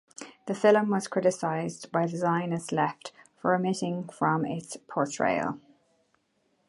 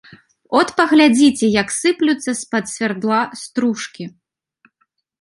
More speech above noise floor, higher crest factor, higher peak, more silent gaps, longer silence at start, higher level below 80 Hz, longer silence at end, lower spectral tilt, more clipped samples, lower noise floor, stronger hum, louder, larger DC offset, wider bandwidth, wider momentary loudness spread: second, 45 dB vs 51 dB; about the same, 20 dB vs 18 dB; second, -8 dBFS vs 0 dBFS; neither; second, 0.2 s vs 0.5 s; second, -72 dBFS vs -58 dBFS; about the same, 1.1 s vs 1.1 s; first, -5.5 dB/octave vs -3.5 dB/octave; neither; first, -72 dBFS vs -67 dBFS; neither; second, -28 LUFS vs -16 LUFS; neither; about the same, 11.5 kHz vs 11.5 kHz; about the same, 13 LU vs 12 LU